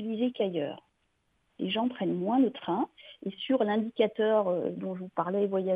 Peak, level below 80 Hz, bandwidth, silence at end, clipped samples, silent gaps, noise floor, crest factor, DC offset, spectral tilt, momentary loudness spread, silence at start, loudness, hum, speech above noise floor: -12 dBFS; -76 dBFS; 4.8 kHz; 0 s; under 0.1%; none; -74 dBFS; 18 dB; under 0.1%; -9 dB/octave; 11 LU; 0 s; -30 LUFS; none; 45 dB